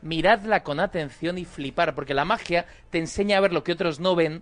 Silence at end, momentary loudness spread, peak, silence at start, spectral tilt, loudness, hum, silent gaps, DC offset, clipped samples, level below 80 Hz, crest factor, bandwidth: 0 s; 9 LU; -6 dBFS; 0 s; -5 dB/octave; -24 LUFS; none; none; under 0.1%; under 0.1%; -48 dBFS; 18 dB; 10 kHz